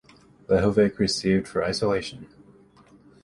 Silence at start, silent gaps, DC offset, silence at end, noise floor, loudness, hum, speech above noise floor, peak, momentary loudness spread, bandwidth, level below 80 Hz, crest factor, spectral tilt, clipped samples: 0.5 s; none; under 0.1%; 1 s; -54 dBFS; -23 LUFS; none; 31 dB; -8 dBFS; 8 LU; 11.5 kHz; -48 dBFS; 18 dB; -5.5 dB/octave; under 0.1%